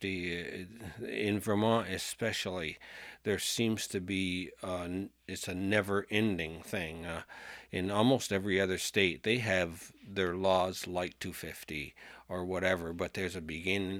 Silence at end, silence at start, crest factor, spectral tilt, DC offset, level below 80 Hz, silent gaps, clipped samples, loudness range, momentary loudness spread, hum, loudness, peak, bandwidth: 0 s; 0 s; 22 dB; -4.5 dB/octave; under 0.1%; -62 dBFS; none; under 0.1%; 4 LU; 13 LU; none; -34 LUFS; -12 dBFS; 19 kHz